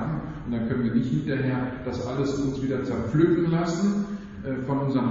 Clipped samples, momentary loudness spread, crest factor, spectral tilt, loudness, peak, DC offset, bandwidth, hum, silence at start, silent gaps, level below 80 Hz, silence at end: under 0.1%; 9 LU; 18 dB; -7.5 dB/octave; -26 LUFS; -8 dBFS; under 0.1%; 7.4 kHz; none; 0 s; none; -48 dBFS; 0 s